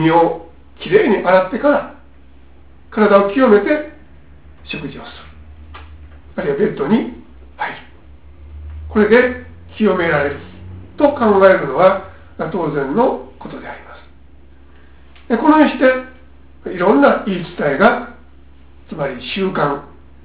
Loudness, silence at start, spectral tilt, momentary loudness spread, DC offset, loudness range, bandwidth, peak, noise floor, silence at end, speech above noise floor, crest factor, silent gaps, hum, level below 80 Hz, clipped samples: -15 LUFS; 0 s; -10 dB/octave; 22 LU; 0.7%; 8 LU; 4 kHz; 0 dBFS; -45 dBFS; 0.4 s; 31 dB; 16 dB; none; none; -42 dBFS; under 0.1%